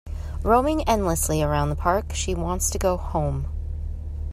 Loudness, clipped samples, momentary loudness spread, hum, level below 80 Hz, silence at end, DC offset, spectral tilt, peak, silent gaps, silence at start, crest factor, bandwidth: -24 LUFS; under 0.1%; 12 LU; none; -30 dBFS; 0 s; under 0.1%; -5 dB/octave; -6 dBFS; none; 0.05 s; 18 dB; 14 kHz